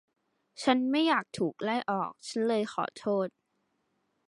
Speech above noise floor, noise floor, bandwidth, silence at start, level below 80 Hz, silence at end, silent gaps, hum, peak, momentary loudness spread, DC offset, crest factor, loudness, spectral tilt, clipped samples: 48 dB; -77 dBFS; 11.5 kHz; 0.6 s; -78 dBFS; 1 s; none; none; -12 dBFS; 8 LU; under 0.1%; 20 dB; -30 LUFS; -5 dB/octave; under 0.1%